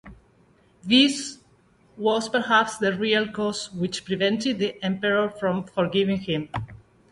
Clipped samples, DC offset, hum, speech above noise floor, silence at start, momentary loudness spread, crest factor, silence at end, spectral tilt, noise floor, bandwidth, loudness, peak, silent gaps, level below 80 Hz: under 0.1%; under 0.1%; none; 35 dB; 0.05 s; 10 LU; 20 dB; 0.35 s; -4.5 dB/octave; -59 dBFS; 11.5 kHz; -23 LUFS; -6 dBFS; none; -58 dBFS